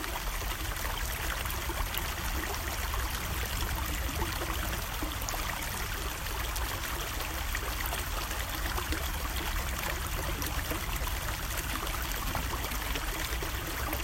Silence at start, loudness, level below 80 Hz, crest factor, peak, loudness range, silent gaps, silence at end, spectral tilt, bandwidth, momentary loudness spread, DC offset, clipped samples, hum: 0 s; -34 LUFS; -36 dBFS; 22 dB; -12 dBFS; 1 LU; none; 0 s; -3 dB/octave; 16.5 kHz; 1 LU; under 0.1%; under 0.1%; none